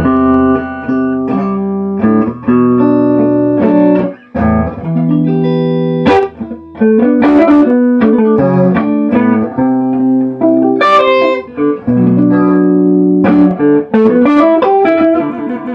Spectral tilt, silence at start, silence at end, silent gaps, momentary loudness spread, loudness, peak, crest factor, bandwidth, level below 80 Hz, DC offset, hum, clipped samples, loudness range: -9.5 dB/octave; 0 s; 0 s; none; 7 LU; -10 LUFS; 0 dBFS; 10 dB; 5.8 kHz; -38 dBFS; under 0.1%; none; under 0.1%; 3 LU